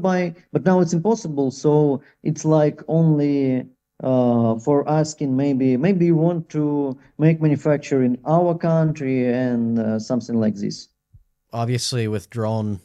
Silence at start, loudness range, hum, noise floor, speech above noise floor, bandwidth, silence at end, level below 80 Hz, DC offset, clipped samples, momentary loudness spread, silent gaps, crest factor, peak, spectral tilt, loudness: 0 s; 4 LU; none; -55 dBFS; 36 dB; 11.5 kHz; 0.05 s; -60 dBFS; under 0.1%; under 0.1%; 7 LU; none; 16 dB; -4 dBFS; -7 dB/octave; -20 LUFS